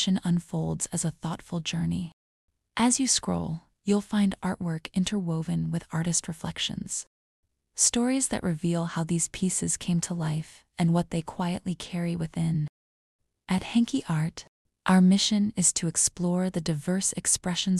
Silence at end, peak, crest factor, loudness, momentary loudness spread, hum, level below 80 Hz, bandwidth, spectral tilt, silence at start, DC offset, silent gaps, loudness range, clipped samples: 0 s; -8 dBFS; 20 dB; -27 LUFS; 11 LU; none; -54 dBFS; 13 kHz; -4 dB/octave; 0 s; under 0.1%; 2.13-2.48 s, 7.07-7.43 s, 12.69-13.19 s, 14.48-14.65 s; 5 LU; under 0.1%